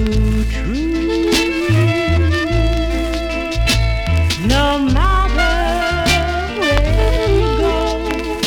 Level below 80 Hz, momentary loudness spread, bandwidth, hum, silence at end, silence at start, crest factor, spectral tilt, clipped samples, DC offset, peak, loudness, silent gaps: -20 dBFS; 5 LU; 17.5 kHz; none; 0 s; 0 s; 14 dB; -5.5 dB/octave; under 0.1%; under 0.1%; 0 dBFS; -16 LUFS; none